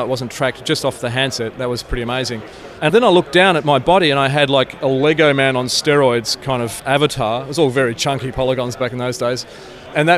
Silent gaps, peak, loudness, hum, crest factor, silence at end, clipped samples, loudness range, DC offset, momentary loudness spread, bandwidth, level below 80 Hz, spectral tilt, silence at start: none; -2 dBFS; -16 LUFS; none; 14 dB; 0 s; under 0.1%; 5 LU; under 0.1%; 9 LU; 15.5 kHz; -40 dBFS; -4.5 dB/octave; 0 s